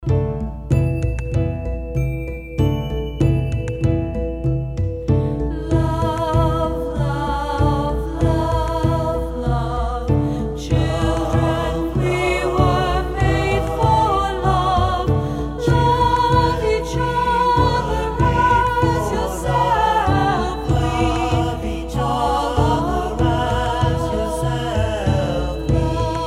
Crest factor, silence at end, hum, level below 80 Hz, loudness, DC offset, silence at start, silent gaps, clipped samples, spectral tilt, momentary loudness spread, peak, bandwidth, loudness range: 16 dB; 0 s; none; -26 dBFS; -19 LUFS; under 0.1%; 0 s; none; under 0.1%; -7 dB/octave; 7 LU; -2 dBFS; 14 kHz; 4 LU